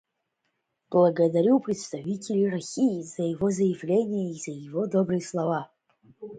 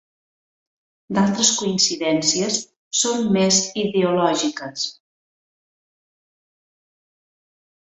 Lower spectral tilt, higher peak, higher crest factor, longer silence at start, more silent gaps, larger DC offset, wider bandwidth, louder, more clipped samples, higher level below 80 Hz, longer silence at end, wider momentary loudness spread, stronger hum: first, -7 dB/octave vs -3 dB/octave; second, -8 dBFS vs -4 dBFS; about the same, 18 dB vs 20 dB; second, 0.9 s vs 1.1 s; second, none vs 2.76-2.91 s; neither; first, 9.4 kHz vs 8.4 kHz; second, -26 LUFS vs -19 LUFS; neither; second, -68 dBFS vs -62 dBFS; second, 0 s vs 3 s; about the same, 11 LU vs 9 LU; neither